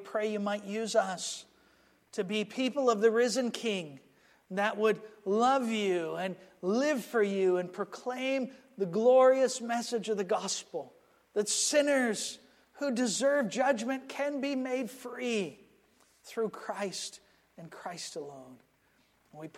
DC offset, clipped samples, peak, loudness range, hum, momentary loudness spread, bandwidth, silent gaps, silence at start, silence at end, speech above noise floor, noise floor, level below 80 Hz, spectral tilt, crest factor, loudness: under 0.1%; under 0.1%; -14 dBFS; 10 LU; none; 15 LU; 15 kHz; none; 0 s; 0 s; 39 dB; -69 dBFS; -82 dBFS; -3.5 dB/octave; 18 dB; -31 LUFS